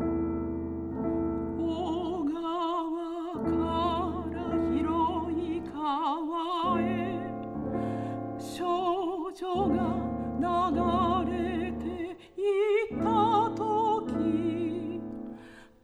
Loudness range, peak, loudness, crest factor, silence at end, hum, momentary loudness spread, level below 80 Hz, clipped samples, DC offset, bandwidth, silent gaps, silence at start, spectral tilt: 3 LU; -14 dBFS; -30 LUFS; 16 dB; 0.15 s; none; 9 LU; -50 dBFS; under 0.1%; under 0.1%; 11 kHz; none; 0 s; -7.5 dB/octave